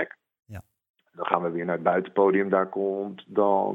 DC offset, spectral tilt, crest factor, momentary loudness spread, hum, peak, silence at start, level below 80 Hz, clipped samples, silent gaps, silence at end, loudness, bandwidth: under 0.1%; -9 dB/octave; 24 dB; 23 LU; none; -2 dBFS; 0 s; -68 dBFS; under 0.1%; 0.89-0.94 s; 0 s; -25 LUFS; 3.9 kHz